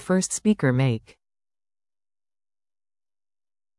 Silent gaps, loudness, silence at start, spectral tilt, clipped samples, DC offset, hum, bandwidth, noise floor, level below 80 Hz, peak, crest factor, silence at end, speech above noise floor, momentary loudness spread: none; -23 LUFS; 0 s; -5.5 dB/octave; under 0.1%; under 0.1%; none; 12 kHz; under -90 dBFS; -62 dBFS; -8 dBFS; 20 dB; 2.8 s; over 68 dB; 5 LU